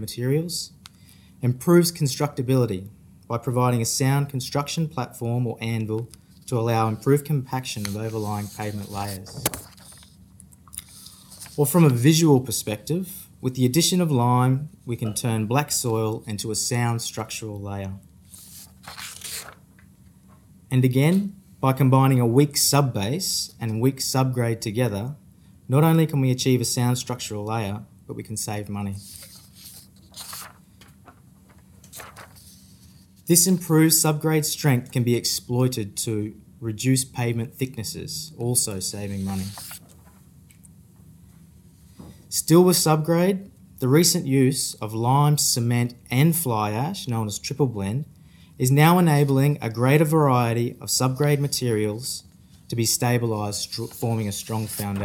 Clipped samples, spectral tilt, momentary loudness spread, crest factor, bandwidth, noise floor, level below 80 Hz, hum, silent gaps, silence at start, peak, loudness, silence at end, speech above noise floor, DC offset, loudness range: under 0.1%; -5 dB/octave; 18 LU; 24 dB; 17.5 kHz; -52 dBFS; -58 dBFS; none; none; 0 s; 0 dBFS; -22 LUFS; 0 s; 30 dB; under 0.1%; 12 LU